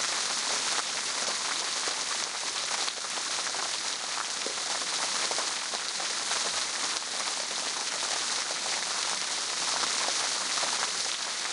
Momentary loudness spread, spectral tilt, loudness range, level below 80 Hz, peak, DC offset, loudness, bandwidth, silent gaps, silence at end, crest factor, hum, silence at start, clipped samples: 3 LU; 1.5 dB/octave; 2 LU; -76 dBFS; -10 dBFS; under 0.1%; -28 LUFS; 11.5 kHz; none; 0 s; 20 dB; none; 0 s; under 0.1%